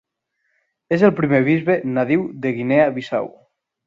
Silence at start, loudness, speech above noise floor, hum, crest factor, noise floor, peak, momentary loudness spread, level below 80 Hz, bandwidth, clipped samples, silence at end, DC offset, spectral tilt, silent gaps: 0.9 s; -18 LUFS; 55 dB; none; 18 dB; -72 dBFS; 0 dBFS; 9 LU; -60 dBFS; 7.6 kHz; under 0.1%; 0.55 s; under 0.1%; -8.5 dB/octave; none